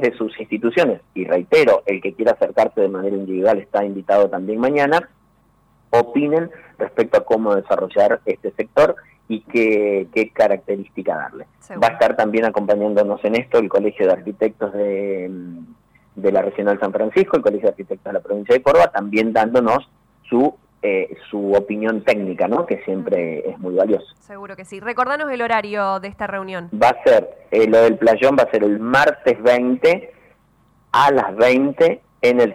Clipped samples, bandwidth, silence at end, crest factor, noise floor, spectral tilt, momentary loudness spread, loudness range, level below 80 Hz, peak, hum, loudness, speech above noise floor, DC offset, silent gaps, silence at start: under 0.1%; 12.5 kHz; 0 s; 12 dB; -57 dBFS; -6 dB/octave; 11 LU; 5 LU; -56 dBFS; -6 dBFS; none; -18 LUFS; 40 dB; under 0.1%; none; 0 s